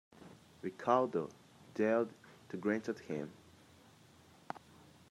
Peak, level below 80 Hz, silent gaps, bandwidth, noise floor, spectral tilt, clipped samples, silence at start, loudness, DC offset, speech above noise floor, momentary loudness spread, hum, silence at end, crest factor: -16 dBFS; -80 dBFS; none; 14.5 kHz; -63 dBFS; -6.5 dB/octave; under 0.1%; 0.2 s; -37 LUFS; under 0.1%; 27 dB; 21 LU; none; 0.55 s; 24 dB